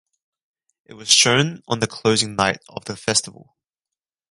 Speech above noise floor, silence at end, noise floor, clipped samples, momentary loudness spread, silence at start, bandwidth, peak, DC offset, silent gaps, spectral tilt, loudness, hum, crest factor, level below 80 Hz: 68 dB; 1 s; -88 dBFS; under 0.1%; 18 LU; 0.9 s; 16 kHz; 0 dBFS; under 0.1%; none; -2.5 dB/octave; -18 LUFS; none; 22 dB; -56 dBFS